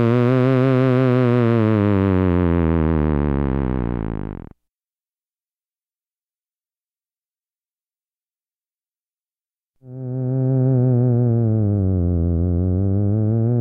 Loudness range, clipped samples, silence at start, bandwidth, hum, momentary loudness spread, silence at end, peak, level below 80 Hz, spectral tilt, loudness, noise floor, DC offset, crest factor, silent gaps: 13 LU; under 0.1%; 0 s; 5 kHz; none; 9 LU; 0 s; -6 dBFS; -34 dBFS; -11 dB/octave; -18 LUFS; under -90 dBFS; under 0.1%; 12 dB; 6.23-6.27 s, 7.18-7.22 s, 7.39-7.43 s, 7.71-7.76 s